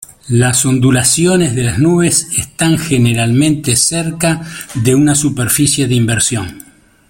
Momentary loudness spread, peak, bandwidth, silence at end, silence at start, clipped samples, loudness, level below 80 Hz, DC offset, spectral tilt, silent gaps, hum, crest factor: 6 LU; 0 dBFS; 17 kHz; 0.5 s; 0.25 s; under 0.1%; -12 LUFS; -40 dBFS; under 0.1%; -4.5 dB/octave; none; none; 12 dB